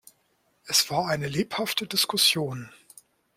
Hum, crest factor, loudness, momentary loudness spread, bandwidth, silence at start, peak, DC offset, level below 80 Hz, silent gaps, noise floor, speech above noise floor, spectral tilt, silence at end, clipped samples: none; 22 dB; -24 LUFS; 12 LU; 16.5 kHz; 0.65 s; -6 dBFS; under 0.1%; -64 dBFS; none; -69 dBFS; 43 dB; -2.5 dB/octave; 0.7 s; under 0.1%